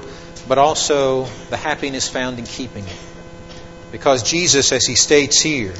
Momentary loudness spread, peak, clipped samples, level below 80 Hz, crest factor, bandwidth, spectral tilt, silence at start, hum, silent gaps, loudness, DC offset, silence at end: 22 LU; 0 dBFS; under 0.1%; -44 dBFS; 18 dB; 8.2 kHz; -2 dB/octave; 0 s; none; none; -15 LUFS; 0.6%; 0 s